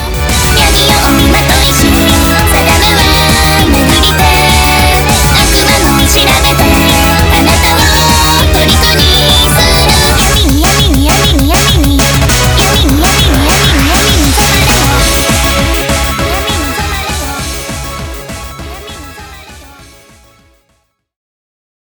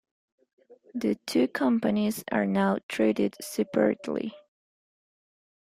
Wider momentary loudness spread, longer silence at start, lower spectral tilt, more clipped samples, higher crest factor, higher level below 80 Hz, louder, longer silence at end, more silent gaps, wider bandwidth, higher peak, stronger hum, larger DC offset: first, 10 LU vs 7 LU; second, 0 s vs 0.7 s; second, -3.5 dB/octave vs -6 dB/octave; neither; second, 8 dB vs 18 dB; first, -14 dBFS vs -68 dBFS; first, -7 LUFS vs -27 LUFS; first, 2.2 s vs 1.3 s; second, none vs 2.83-2.89 s; first, over 20 kHz vs 15.5 kHz; first, 0 dBFS vs -10 dBFS; neither; neither